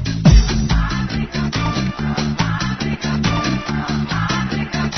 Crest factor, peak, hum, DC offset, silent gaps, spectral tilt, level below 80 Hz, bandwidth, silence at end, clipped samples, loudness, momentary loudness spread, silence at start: 16 dB; 0 dBFS; none; under 0.1%; none; -5.5 dB/octave; -22 dBFS; 6.4 kHz; 0 s; under 0.1%; -19 LUFS; 8 LU; 0 s